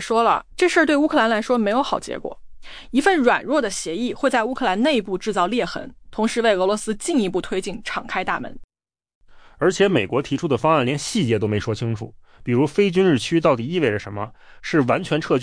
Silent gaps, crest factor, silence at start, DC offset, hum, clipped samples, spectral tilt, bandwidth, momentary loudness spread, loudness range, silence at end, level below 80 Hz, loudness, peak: 8.64-8.68 s, 9.15-9.21 s; 16 dB; 0 s; under 0.1%; none; under 0.1%; -5 dB/octave; 10.5 kHz; 11 LU; 4 LU; 0 s; -48 dBFS; -20 LUFS; -6 dBFS